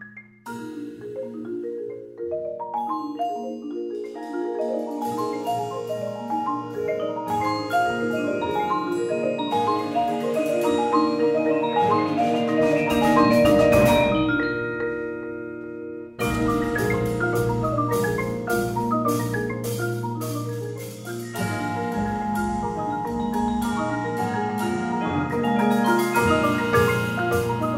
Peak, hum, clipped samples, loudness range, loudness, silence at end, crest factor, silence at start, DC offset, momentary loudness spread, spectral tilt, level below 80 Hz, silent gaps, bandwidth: -4 dBFS; none; under 0.1%; 9 LU; -24 LUFS; 0 s; 18 dB; 0 s; under 0.1%; 12 LU; -6 dB/octave; -46 dBFS; none; 16 kHz